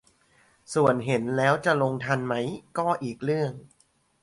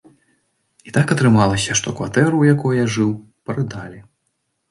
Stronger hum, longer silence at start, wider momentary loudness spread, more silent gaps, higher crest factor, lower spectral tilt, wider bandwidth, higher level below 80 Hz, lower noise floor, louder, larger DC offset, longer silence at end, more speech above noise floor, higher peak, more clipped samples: neither; second, 0.7 s vs 0.85 s; second, 8 LU vs 13 LU; neither; about the same, 18 dB vs 18 dB; about the same, -6 dB/octave vs -5.5 dB/octave; about the same, 11.5 kHz vs 11.5 kHz; second, -64 dBFS vs -48 dBFS; second, -62 dBFS vs -71 dBFS; second, -26 LUFS vs -17 LUFS; neither; second, 0.55 s vs 0.7 s; second, 37 dB vs 54 dB; second, -8 dBFS vs -2 dBFS; neither